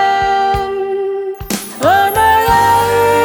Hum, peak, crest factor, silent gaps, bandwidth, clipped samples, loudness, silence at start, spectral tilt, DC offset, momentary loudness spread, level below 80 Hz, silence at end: none; 0 dBFS; 12 dB; none; 19.5 kHz; under 0.1%; -13 LUFS; 0 s; -4 dB/octave; under 0.1%; 10 LU; -34 dBFS; 0 s